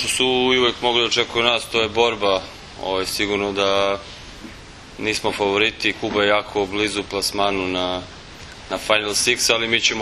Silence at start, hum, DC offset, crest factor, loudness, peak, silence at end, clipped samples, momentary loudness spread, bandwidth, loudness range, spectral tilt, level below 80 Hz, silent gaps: 0 s; none; under 0.1%; 20 dB; -19 LUFS; 0 dBFS; 0 s; under 0.1%; 20 LU; 13.5 kHz; 3 LU; -2.5 dB/octave; -46 dBFS; none